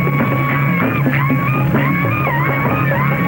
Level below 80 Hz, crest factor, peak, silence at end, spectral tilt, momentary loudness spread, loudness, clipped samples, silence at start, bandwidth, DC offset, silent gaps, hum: -40 dBFS; 12 dB; -2 dBFS; 0 s; -8.5 dB/octave; 1 LU; -15 LUFS; under 0.1%; 0 s; 17 kHz; under 0.1%; none; none